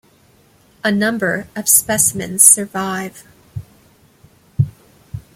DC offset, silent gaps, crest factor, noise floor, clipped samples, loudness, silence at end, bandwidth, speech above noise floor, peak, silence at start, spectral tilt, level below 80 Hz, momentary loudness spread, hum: under 0.1%; none; 18 dB; -52 dBFS; under 0.1%; -14 LUFS; 0.15 s; 17 kHz; 36 dB; 0 dBFS; 0.85 s; -3 dB/octave; -50 dBFS; 26 LU; none